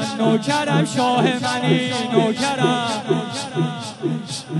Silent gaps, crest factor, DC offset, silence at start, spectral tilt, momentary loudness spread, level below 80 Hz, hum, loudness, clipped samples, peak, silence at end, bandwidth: none; 16 dB; under 0.1%; 0 s; -5 dB/octave; 7 LU; -62 dBFS; none; -20 LUFS; under 0.1%; -4 dBFS; 0 s; 11.5 kHz